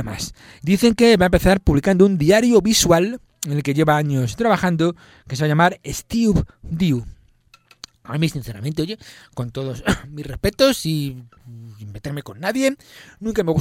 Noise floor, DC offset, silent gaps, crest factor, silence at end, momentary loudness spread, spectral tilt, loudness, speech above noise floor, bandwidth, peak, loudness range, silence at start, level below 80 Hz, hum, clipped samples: -54 dBFS; under 0.1%; none; 18 dB; 0 s; 17 LU; -5.5 dB/octave; -19 LUFS; 36 dB; 16.5 kHz; 0 dBFS; 10 LU; 0 s; -36 dBFS; none; under 0.1%